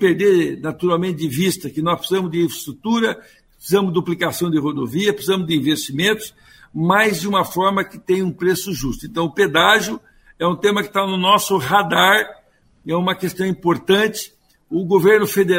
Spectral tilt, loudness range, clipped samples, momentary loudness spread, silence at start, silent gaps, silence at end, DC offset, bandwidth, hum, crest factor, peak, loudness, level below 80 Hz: -4.5 dB/octave; 3 LU; under 0.1%; 11 LU; 0 s; none; 0 s; under 0.1%; 16.5 kHz; none; 18 dB; 0 dBFS; -18 LUFS; -50 dBFS